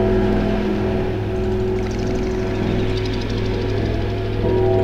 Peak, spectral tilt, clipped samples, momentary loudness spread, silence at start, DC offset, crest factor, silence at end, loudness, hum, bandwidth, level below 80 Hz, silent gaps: -6 dBFS; -7.5 dB/octave; under 0.1%; 4 LU; 0 s; under 0.1%; 14 dB; 0 s; -21 LUFS; none; 8 kHz; -28 dBFS; none